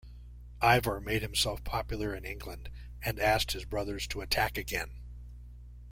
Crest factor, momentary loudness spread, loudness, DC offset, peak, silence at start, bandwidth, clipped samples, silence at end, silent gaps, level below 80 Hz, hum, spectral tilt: 24 dB; 23 LU; -31 LUFS; under 0.1%; -10 dBFS; 0.05 s; 16.5 kHz; under 0.1%; 0 s; none; -44 dBFS; 60 Hz at -45 dBFS; -3.5 dB/octave